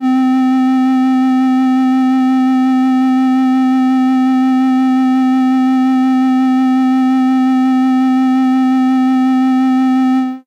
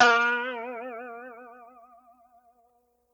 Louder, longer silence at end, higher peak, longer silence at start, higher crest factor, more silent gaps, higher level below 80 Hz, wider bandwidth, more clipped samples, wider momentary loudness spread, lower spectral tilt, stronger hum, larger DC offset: first, -12 LUFS vs -27 LUFS; second, 0.05 s vs 1.5 s; about the same, -8 dBFS vs -6 dBFS; about the same, 0 s vs 0 s; second, 2 dB vs 22 dB; neither; about the same, -74 dBFS vs -78 dBFS; about the same, 7.2 kHz vs 7.6 kHz; neither; second, 0 LU vs 26 LU; first, -5 dB/octave vs -1 dB/octave; neither; neither